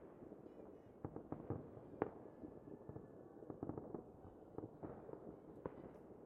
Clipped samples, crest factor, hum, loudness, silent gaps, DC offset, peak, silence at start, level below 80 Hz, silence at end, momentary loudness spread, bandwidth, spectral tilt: under 0.1%; 32 dB; none; -54 LUFS; none; under 0.1%; -22 dBFS; 0 s; -72 dBFS; 0 s; 11 LU; 3.9 kHz; -6.5 dB/octave